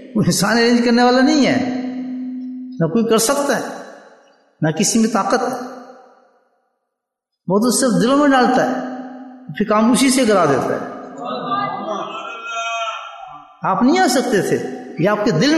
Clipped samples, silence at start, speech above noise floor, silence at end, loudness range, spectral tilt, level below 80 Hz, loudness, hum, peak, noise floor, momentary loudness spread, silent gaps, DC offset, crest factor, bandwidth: under 0.1%; 0 s; 64 dB; 0 s; 5 LU; -4.5 dB/octave; -56 dBFS; -17 LUFS; none; -4 dBFS; -79 dBFS; 17 LU; none; under 0.1%; 14 dB; 12.5 kHz